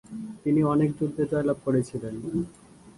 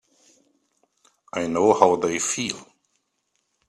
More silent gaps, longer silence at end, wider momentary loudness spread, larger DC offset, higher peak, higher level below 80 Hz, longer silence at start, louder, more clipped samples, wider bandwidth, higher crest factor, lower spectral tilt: neither; second, 0.05 s vs 1.05 s; second, 11 LU vs 14 LU; neither; second, -12 dBFS vs 0 dBFS; first, -56 dBFS vs -66 dBFS; second, 0.1 s vs 1.35 s; second, -27 LUFS vs -22 LUFS; neither; second, 11.5 kHz vs 13 kHz; second, 14 dB vs 24 dB; first, -8.5 dB/octave vs -3.5 dB/octave